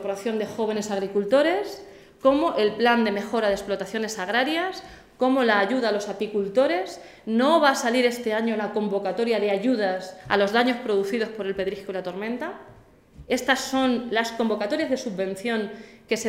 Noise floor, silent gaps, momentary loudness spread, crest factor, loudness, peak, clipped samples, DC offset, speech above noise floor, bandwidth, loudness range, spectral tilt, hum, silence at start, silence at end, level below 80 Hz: -49 dBFS; none; 10 LU; 18 dB; -24 LUFS; -6 dBFS; under 0.1%; under 0.1%; 25 dB; 16 kHz; 4 LU; -4 dB/octave; none; 0 s; 0 s; -60 dBFS